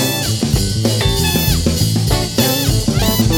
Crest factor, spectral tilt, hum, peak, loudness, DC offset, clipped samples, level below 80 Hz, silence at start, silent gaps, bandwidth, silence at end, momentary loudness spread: 14 dB; -4.5 dB/octave; none; 0 dBFS; -15 LUFS; under 0.1%; under 0.1%; -24 dBFS; 0 s; none; over 20 kHz; 0 s; 2 LU